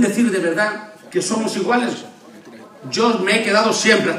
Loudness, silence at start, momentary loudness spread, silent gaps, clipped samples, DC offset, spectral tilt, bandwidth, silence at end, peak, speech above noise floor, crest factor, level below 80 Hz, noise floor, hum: -18 LUFS; 0 s; 11 LU; none; under 0.1%; under 0.1%; -3.5 dB/octave; 15 kHz; 0 s; 0 dBFS; 23 dB; 18 dB; -74 dBFS; -41 dBFS; none